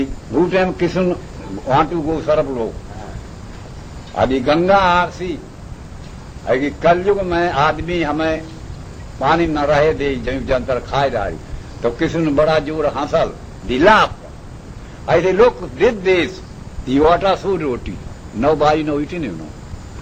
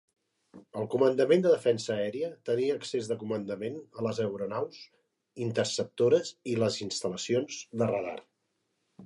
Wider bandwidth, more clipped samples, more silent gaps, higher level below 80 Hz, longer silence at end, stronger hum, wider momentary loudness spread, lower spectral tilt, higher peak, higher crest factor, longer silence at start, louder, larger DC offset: second, 9.2 kHz vs 11.5 kHz; neither; neither; first, -34 dBFS vs -72 dBFS; about the same, 0 s vs 0 s; neither; first, 20 LU vs 12 LU; first, -6.5 dB/octave vs -5 dB/octave; first, 0 dBFS vs -12 dBFS; about the same, 18 dB vs 18 dB; second, 0 s vs 0.55 s; first, -17 LUFS vs -30 LUFS; first, 0.2% vs under 0.1%